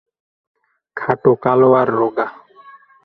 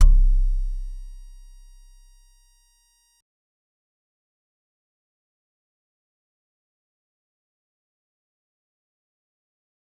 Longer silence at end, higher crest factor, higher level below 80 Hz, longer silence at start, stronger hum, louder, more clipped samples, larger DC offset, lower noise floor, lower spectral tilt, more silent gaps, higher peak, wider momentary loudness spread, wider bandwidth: second, 0.7 s vs 8.85 s; about the same, 18 dB vs 22 dB; second, -60 dBFS vs -26 dBFS; first, 0.95 s vs 0 s; neither; first, -16 LUFS vs -26 LUFS; neither; neither; second, -44 dBFS vs -63 dBFS; first, -10 dB/octave vs -6 dB/octave; neither; first, 0 dBFS vs -4 dBFS; second, 14 LU vs 27 LU; first, 4.5 kHz vs 1.4 kHz